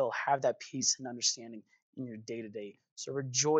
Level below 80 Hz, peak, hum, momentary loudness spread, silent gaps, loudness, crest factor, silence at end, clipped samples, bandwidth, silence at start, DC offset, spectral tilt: under -90 dBFS; -16 dBFS; none; 17 LU; 1.82-1.93 s, 2.91-2.96 s; -33 LUFS; 18 dB; 0 s; under 0.1%; 9.4 kHz; 0 s; under 0.1%; -2.5 dB/octave